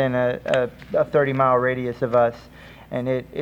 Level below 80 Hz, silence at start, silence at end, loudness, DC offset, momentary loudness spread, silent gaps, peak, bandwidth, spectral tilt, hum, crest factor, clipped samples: -52 dBFS; 0 s; 0 s; -22 LUFS; under 0.1%; 8 LU; none; -4 dBFS; 15 kHz; -7.5 dB/octave; none; 18 dB; under 0.1%